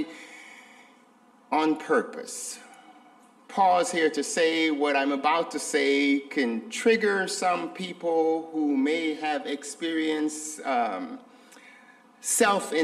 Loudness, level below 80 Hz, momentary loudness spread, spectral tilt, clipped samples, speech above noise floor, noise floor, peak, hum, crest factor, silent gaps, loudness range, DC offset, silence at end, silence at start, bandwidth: -26 LUFS; -80 dBFS; 13 LU; -2.5 dB/octave; under 0.1%; 32 dB; -58 dBFS; -10 dBFS; none; 18 dB; none; 6 LU; under 0.1%; 0 s; 0 s; 15 kHz